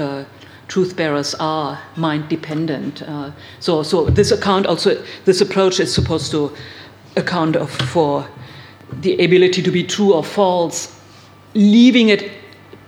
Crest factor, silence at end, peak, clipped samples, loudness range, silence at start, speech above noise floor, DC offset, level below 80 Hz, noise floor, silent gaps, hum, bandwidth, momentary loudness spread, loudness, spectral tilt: 16 dB; 0.1 s; -2 dBFS; under 0.1%; 6 LU; 0 s; 27 dB; under 0.1%; -42 dBFS; -43 dBFS; none; none; 19 kHz; 16 LU; -16 LUFS; -5.5 dB/octave